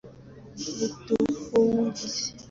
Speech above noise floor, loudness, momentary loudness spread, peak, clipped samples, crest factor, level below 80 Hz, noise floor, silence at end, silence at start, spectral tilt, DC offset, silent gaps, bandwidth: 17 dB; -27 LUFS; 12 LU; -10 dBFS; under 0.1%; 16 dB; -58 dBFS; -47 dBFS; 0.05 s; 0.05 s; -4.5 dB/octave; under 0.1%; none; 7.6 kHz